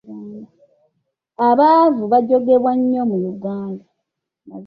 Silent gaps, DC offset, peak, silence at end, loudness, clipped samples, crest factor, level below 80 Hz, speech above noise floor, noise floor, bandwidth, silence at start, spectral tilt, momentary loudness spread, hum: none; under 0.1%; -2 dBFS; 0 s; -16 LUFS; under 0.1%; 16 dB; -64 dBFS; 63 dB; -78 dBFS; 5.4 kHz; 0.05 s; -10 dB/octave; 22 LU; none